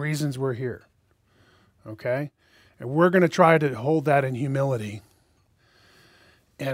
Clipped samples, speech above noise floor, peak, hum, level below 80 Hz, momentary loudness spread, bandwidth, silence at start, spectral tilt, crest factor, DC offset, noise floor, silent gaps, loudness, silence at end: under 0.1%; 41 dB; -2 dBFS; none; -66 dBFS; 19 LU; 16 kHz; 0 s; -7 dB/octave; 24 dB; under 0.1%; -64 dBFS; none; -23 LUFS; 0 s